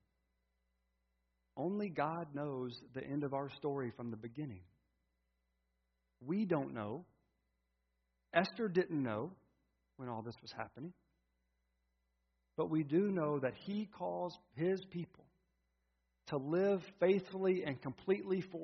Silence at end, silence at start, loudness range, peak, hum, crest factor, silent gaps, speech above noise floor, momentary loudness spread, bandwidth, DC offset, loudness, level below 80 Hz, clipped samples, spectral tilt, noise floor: 0 s; 1.55 s; 7 LU; -14 dBFS; none; 26 dB; none; 45 dB; 14 LU; 6 kHz; under 0.1%; -39 LUFS; -78 dBFS; under 0.1%; -6 dB/octave; -84 dBFS